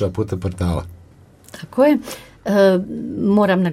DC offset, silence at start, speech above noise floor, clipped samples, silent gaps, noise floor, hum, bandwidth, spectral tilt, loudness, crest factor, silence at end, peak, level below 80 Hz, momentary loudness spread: under 0.1%; 0 s; 29 dB; under 0.1%; none; -46 dBFS; none; 15.5 kHz; -7 dB/octave; -18 LUFS; 16 dB; 0 s; -2 dBFS; -42 dBFS; 15 LU